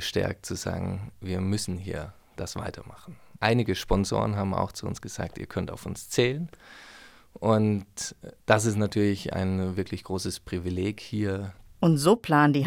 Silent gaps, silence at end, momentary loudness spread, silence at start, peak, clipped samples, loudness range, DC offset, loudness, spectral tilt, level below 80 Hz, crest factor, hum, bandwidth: none; 0 s; 15 LU; 0 s; -4 dBFS; under 0.1%; 4 LU; under 0.1%; -28 LUFS; -5.5 dB/octave; -46 dBFS; 22 dB; none; 18.5 kHz